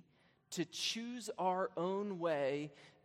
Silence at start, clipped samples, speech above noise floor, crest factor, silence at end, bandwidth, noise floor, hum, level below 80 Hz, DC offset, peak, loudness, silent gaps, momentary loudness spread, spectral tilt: 0.5 s; under 0.1%; 32 dB; 16 dB; 0.15 s; 16 kHz; -71 dBFS; none; -88 dBFS; under 0.1%; -24 dBFS; -39 LUFS; none; 8 LU; -4 dB/octave